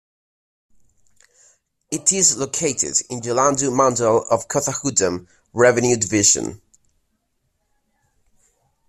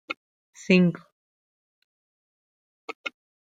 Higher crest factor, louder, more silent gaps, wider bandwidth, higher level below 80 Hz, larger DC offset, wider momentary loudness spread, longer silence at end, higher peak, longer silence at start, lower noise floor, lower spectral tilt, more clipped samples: about the same, 20 dB vs 24 dB; first, -18 LUFS vs -23 LUFS; second, none vs 0.17-0.53 s, 1.12-2.88 s, 2.95-3.04 s; first, 14.5 kHz vs 7.8 kHz; first, -56 dBFS vs -70 dBFS; neither; second, 9 LU vs 24 LU; first, 2.35 s vs 0.4 s; first, -2 dBFS vs -6 dBFS; first, 1.9 s vs 0.1 s; second, -70 dBFS vs under -90 dBFS; second, -3 dB/octave vs -6.5 dB/octave; neither